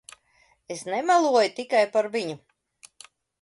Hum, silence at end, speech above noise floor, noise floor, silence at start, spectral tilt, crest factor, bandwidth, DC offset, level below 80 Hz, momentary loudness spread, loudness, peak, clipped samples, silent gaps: none; 1.05 s; 41 dB; -64 dBFS; 0.7 s; -3.5 dB/octave; 18 dB; 11.5 kHz; under 0.1%; -76 dBFS; 17 LU; -23 LUFS; -8 dBFS; under 0.1%; none